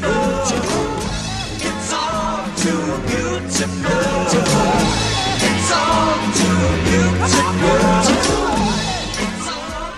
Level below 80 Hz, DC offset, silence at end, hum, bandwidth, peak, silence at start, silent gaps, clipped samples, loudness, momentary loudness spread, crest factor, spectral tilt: -32 dBFS; 0.3%; 0 s; none; 13.5 kHz; -2 dBFS; 0 s; none; under 0.1%; -17 LUFS; 7 LU; 16 dB; -4 dB/octave